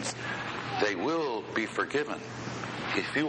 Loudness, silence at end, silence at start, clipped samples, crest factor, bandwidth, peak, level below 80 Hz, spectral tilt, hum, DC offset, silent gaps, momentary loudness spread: -32 LUFS; 0 s; 0 s; under 0.1%; 16 dB; 9.4 kHz; -16 dBFS; -64 dBFS; -4 dB/octave; none; under 0.1%; none; 7 LU